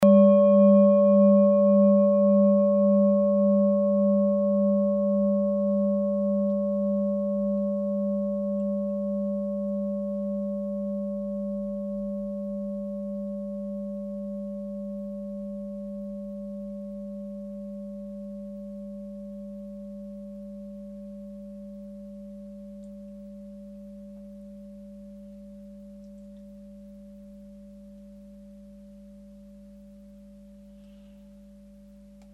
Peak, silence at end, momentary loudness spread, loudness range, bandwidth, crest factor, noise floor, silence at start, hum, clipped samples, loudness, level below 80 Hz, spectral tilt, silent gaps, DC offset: -8 dBFS; 1.4 s; 25 LU; 25 LU; 3.4 kHz; 18 dB; -50 dBFS; 0 s; 50 Hz at -45 dBFS; under 0.1%; -24 LUFS; -58 dBFS; -11 dB/octave; none; under 0.1%